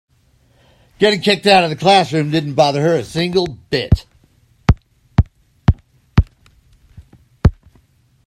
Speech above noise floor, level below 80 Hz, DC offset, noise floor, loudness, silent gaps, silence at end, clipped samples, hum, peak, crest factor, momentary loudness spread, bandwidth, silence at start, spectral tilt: 41 dB; -28 dBFS; under 0.1%; -55 dBFS; -16 LUFS; none; 0.75 s; under 0.1%; none; 0 dBFS; 18 dB; 8 LU; 13 kHz; 1 s; -6 dB/octave